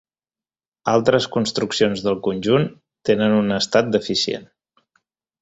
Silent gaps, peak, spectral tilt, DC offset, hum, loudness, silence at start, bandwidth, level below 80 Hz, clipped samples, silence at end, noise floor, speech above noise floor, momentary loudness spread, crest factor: none; -2 dBFS; -5 dB/octave; under 0.1%; none; -20 LUFS; 0.85 s; 8 kHz; -56 dBFS; under 0.1%; 0.95 s; under -90 dBFS; over 71 dB; 8 LU; 20 dB